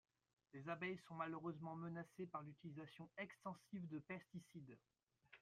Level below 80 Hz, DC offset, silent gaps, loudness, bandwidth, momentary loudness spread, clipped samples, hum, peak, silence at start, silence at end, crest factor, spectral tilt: -88 dBFS; under 0.1%; 5.03-5.07 s; -53 LUFS; 13 kHz; 12 LU; under 0.1%; none; -34 dBFS; 0.55 s; 0 s; 20 dB; -7 dB/octave